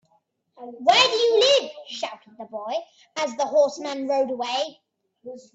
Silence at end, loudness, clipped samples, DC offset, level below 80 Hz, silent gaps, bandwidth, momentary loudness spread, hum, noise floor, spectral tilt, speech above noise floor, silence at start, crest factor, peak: 0.15 s; -22 LUFS; under 0.1%; under 0.1%; -76 dBFS; none; 8.2 kHz; 22 LU; none; -67 dBFS; -1 dB/octave; 45 dB; 0.6 s; 20 dB; -4 dBFS